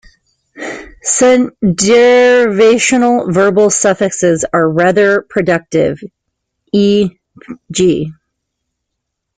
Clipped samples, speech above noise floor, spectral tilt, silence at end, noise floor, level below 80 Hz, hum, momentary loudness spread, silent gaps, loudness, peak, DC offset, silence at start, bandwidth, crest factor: under 0.1%; 64 dB; -4.5 dB/octave; 1.25 s; -74 dBFS; -48 dBFS; none; 13 LU; none; -11 LUFS; 0 dBFS; under 0.1%; 0.55 s; 9.6 kHz; 12 dB